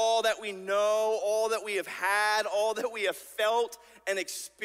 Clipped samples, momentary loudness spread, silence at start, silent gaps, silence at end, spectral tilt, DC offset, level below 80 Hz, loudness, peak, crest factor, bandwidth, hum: under 0.1%; 7 LU; 0 s; none; 0 s; -1 dB/octave; under 0.1%; -76 dBFS; -29 LUFS; -14 dBFS; 16 dB; 16 kHz; none